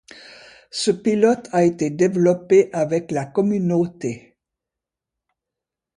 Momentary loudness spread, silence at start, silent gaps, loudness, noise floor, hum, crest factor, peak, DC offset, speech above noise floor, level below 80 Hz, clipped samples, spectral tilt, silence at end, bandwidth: 10 LU; 0.75 s; none; -19 LUFS; -86 dBFS; none; 18 dB; -4 dBFS; under 0.1%; 67 dB; -62 dBFS; under 0.1%; -6 dB/octave; 1.8 s; 11 kHz